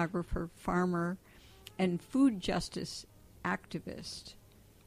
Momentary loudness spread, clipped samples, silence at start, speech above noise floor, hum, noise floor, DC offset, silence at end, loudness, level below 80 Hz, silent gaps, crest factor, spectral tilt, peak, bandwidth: 17 LU; under 0.1%; 0 s; 22 dB; none; -56 dBFS; under 0.1%; 0.55 s; -35 LUFS; -52 dBFS; none; 18 dB; -6 dB/octave; -18 dBFS; 15.5 kHz